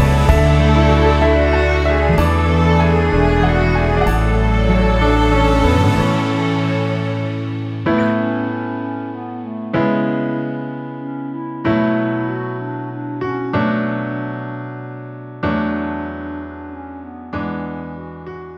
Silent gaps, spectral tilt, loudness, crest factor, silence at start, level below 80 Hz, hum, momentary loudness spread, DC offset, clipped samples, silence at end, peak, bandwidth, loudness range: none; -7.5 dB/octave; -17 LUFS; 16 dB; 0 s; -22 dBFS; none; 15 LU; under 0.1%; under 0.1%; 0 s; 0 dBFS; 13 kHz; 10 LU